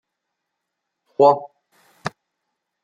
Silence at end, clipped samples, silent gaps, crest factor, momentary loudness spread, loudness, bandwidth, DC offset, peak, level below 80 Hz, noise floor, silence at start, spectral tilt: 0.75 s; under 0.1%; none; 22 dB; 17 LU; -17 LUFS; 9.8 kHz; under 0.1%; -2 dBFS; -74 dBFS; -80 dBFS; 1.2 s; -6.5 dB/octave